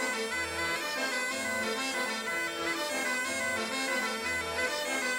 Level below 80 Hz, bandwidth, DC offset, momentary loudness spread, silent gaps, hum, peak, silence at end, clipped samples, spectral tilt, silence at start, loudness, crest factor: -62 dBFS; 17 kHz; under 0.1%; 1 LU; none; none; -20 dBFS; 0 s; under 0.1%; -1.5 dB/octave; 0 s; -31 LUFS; 14 dB